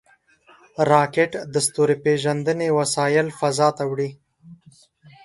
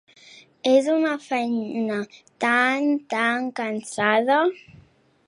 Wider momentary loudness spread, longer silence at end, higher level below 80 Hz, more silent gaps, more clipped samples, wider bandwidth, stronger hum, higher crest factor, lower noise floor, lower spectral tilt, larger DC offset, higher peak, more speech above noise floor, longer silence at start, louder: about the same, 8 LU vs 9 LU; about the same, 0.7 s vs 0.7 s; first, -64 dBFS vs -70 dBFS; neither; neither; about the same, 11.5 kHz vs 11.5 kHz; neither; about the same, 18 dB vs 18 dB; about the same, -55 dBFS vs -55 dBFS; about the same, -4.5 dB/octave vs -4 dB/octave; neither; first, -2 dBFS vs -6 dBFS; about the same, 35 dB vs 33 dB; first, 0.8 s vs 0.65 s; about the same, -21 LUFS vs -22 LUFS